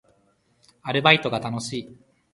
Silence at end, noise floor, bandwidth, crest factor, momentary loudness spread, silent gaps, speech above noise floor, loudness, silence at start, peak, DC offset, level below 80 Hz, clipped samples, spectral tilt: 0.4 s; -65 dBFS; 11.5 kHz; 26 dB; 16 LU; none; 42 dB; -21 LUFS; 0.85 s; 0 dBFS; under 0.1%; -62 dBFS; under 0.1%; -4.5 dB/octave